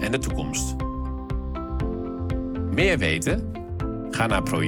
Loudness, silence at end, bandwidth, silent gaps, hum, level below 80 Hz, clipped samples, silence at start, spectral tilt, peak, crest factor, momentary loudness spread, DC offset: -26 LUFS; 0 s; 18 kHz; none; none; -32 dBFS; under 0.1%; 0 s; -5 dB/octave; -8 dBFS; 18 dB; 10 LU; under 0.1%